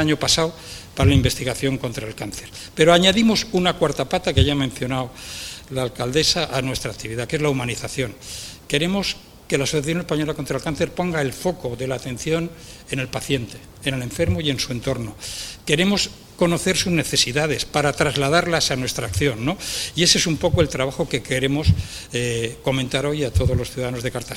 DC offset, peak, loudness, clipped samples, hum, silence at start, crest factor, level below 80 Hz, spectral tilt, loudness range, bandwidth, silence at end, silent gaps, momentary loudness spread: under 0.1%; 0 dBFS; -21 LUFS; under 0.1%; none; 0 s; 22 dB; -38 dBFS; -4 dB/octave; 6 LU; 17 kHz; 0 s; none; 12 LU